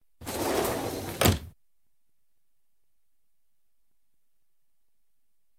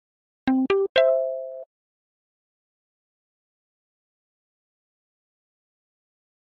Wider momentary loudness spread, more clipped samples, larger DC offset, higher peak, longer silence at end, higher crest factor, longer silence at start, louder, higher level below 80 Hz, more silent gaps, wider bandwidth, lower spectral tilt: second, 9 LU vs 16 LU; neither; neither; about the same, -6 dBFS vs -6 dBFS; second, 4.1 s vs 4.9 s; about the same, 28 dB vs 24 dB; second, 0.2 s vs 0.45 s; second, -28 LUFS vs -22 LUFS; first, -50 dBFS vs -66 dBFS; second, none vs 0.89-0.95 s; first, 19.5 kHz vs 6.4 kHz; first, -4 dB/octave vs -2 dB/octave